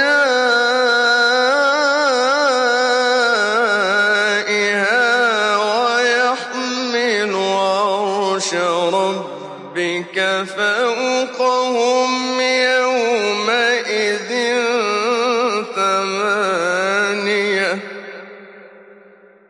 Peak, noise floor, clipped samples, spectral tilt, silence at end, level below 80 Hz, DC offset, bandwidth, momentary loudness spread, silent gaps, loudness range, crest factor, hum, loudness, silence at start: -4 dBFS; -46 dBFS; under 0.1%; -2.5 dB/octave; 0.55 s; -78 dBFS; under 0.1%; 11 kHz; 5 LU; none; 4 LU; 12 dB; none; -16 LUFS; 0 s